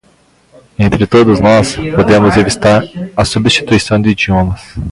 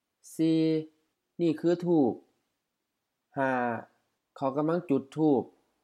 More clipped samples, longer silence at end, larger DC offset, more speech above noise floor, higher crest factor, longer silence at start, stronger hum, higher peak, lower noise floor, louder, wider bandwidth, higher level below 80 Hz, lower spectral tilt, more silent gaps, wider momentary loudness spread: neither; second, 0 s vs 0.35 s; neither; second, 39 dB vs 56 dB; second, 10 dB vs 16 dB; first, 0.8 s vs 0.25 s; neither; first, 0 dBFS vs -12 dBFS; second, -49 dBFS vs -83 dBFS; first, -10 LUFS vs -29 LUFS; about the same, 11.5 kHz vs 12 kHz; first, -30 dBFS vs -82 dBFS; second, -5.5 dB/octave vs -7.5 dB/octave; neither; second, 7 LU vs 15 LU